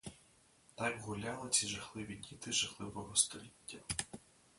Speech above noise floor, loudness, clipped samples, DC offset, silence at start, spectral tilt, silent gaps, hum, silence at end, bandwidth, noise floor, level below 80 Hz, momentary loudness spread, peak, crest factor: 28 dB; -37 LUFS; under 0.1%; under 0.1%; 0.05 s; -1.5 dB/octave; none; none; 0.4 s; 12 kHz; -68 dBFS; -66 dBFS; 17 LU; -16 dBFS; 26 dB